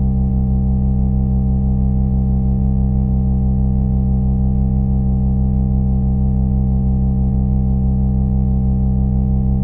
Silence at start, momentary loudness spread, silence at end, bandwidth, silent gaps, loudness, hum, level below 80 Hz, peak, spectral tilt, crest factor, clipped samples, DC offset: 0 s; 0 LU; 0 s; 1.3 kHz; none; -17 LUFS; none; -18 dBFS; -4 dBFS; -15 dB/octave; 10 dB; under 0.1%; under 0.1%